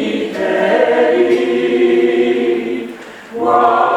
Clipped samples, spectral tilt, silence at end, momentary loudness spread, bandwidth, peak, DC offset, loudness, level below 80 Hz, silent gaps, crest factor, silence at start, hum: under 0.1%; -5.5 dB/octave; 0 s; 11 LU; 9.2 kHz; 0 dBFS; under 0.1%; -14 LUFS; -60 dBFS; none; 14 dB; 0 s; none